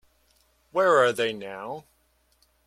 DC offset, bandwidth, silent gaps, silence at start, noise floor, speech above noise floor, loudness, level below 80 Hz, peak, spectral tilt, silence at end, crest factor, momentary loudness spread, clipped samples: under 0.1%; 14 kHz; none; 0.75 s; -67 dBFS; 43 dB; -24 LUFS; -68 dBFS; -8 dBFS; -4 dB/octave; 0.85 s; 20 dB; 18 LU; under 0.1%